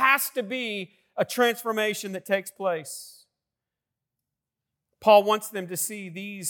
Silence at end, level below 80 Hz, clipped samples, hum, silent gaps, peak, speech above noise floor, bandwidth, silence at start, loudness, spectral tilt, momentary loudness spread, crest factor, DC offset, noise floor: 0 s; -80 dBFS; under 0.1%; none; none; -6 dBFS; 62 dB; 18 kHz; 0 s; -25 LUFS; -2.5 dB/octave; 17 LU; 20 dB; under 0.1%; -88 dBFS